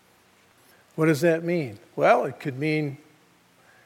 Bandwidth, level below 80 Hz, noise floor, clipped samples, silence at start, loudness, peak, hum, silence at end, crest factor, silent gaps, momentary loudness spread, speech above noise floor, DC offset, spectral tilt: 16.5 kHz; -78 dBFS; -59 dBFS; under 0.1%; 0.95 s; -24 LUFS; -4 dBFS; none; 0.9 s; 22 dB; none; 14 LU; 36 dB; under 0.1%; -6.5 dB/octave